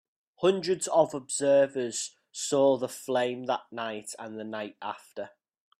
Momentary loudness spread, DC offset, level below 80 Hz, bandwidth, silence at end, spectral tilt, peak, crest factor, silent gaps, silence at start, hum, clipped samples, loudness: 15 LU; under 0.1%; -76 dBFS; 14.5 kHz; 0.5 s; -3.5 dB/octave; -10 dBFS; 20 dB; none; 0.4 s; none; under 0.1%; -28 LUFS